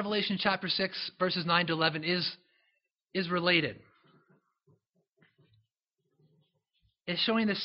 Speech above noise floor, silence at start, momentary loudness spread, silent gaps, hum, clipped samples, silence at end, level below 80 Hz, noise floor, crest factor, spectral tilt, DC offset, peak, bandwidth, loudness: 52 dB; 0 s; 10 LU; none; none; under 0.1%; 0 s; -72 dBFS; -82 dBFS; 22 dB; -2.5 dB/octave; under 0.1%; -10 dBFS; 5.8 kHz; -30 LUFS